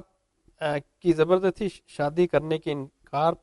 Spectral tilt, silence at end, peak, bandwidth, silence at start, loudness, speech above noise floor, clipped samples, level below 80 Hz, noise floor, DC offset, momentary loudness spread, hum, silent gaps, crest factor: -7 dB/octave; 0.05 s; -8 dBFS; 11.5 kHz; 0.6 s; -26 LUFS; 40 dB; under 0.1%; -56 dBFS; -65 dBFS; under 0.1%; 11 LU; none; none; 18 dB